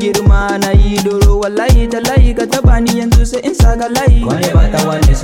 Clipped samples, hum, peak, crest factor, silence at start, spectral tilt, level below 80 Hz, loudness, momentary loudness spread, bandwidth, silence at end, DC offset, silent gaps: under 0.1%; none; 0 dBFS; 10 dB; 0 s; -6 dB/octave; -12 dBFS; -12 LUFS; 2 LU; 17 kHz; 0 s; under 0.1%; none